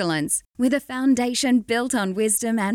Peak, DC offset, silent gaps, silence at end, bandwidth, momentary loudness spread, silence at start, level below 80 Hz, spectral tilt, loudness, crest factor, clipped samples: -10 dBFS; under 0.1%; none; 0 s; 17 kHz; 3 LU; 0 s; -58 dBFS; -3.5 dB/octave; -22 LUFS; 12 dB; under 0.1%